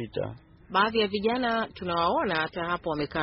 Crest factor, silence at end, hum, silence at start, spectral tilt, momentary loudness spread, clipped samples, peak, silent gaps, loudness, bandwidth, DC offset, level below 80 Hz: 18 dB; 0 s; none; 0 s; -2.5 dB/octave; 7 LU; under 0.1%; -10 dBFS; none; -27 LUFS; 5.8 kHz; under 0.1%; -54 dBFS